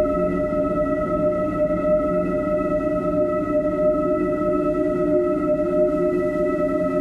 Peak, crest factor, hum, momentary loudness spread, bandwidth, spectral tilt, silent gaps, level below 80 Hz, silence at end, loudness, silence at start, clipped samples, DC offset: -8 dBFS; 12 dB; none; 2 LU; 8.2 kHz; -9.5 dB/octave; none; -40 dBFS; 0 s; -21 LUFS; 0 s; under 0.1%; under 0.1%